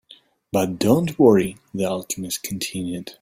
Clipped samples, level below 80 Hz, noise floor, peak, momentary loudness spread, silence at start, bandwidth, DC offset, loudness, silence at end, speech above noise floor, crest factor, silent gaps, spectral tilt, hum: under 0.1%; -54 dBFS; -52 dBFS; -2 dBFS; 12 LU; 0.55 s; 16.5 kHz; under 0.1%; -21 LUFS; 0.1 s; 31 dB; 18 dB; none; -5.5 dB/octave; none